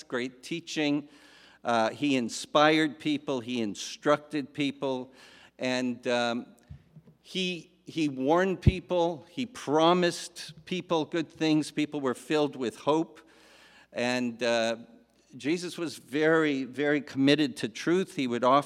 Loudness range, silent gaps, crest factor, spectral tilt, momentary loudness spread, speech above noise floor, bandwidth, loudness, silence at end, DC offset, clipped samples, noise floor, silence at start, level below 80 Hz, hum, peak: 4 LU; none; 22 dB; -5 dB/octave; 12 LU; 28 dB; 14 kHz; -29 LUFS; 0 s; under 0.1%; under 0.1%; -56 dBFS; 0.1 s; -52 dBFS; none; -6 dBFS